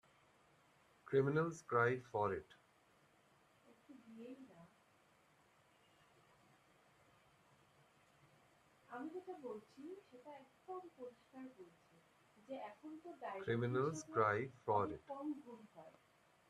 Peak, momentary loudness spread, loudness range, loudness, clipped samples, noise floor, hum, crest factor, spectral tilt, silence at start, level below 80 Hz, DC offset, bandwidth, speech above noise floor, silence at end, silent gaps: -22 dBFS; 22 LU; 22 LU; -42 LUFS; under 0.1%; -73 dBFS; none; 24 dB; -6.5 dB/octave; 1.05 s; -82 dBFS; under 0.1%; 12.5 kHz; 31 dB; 0.6 s; none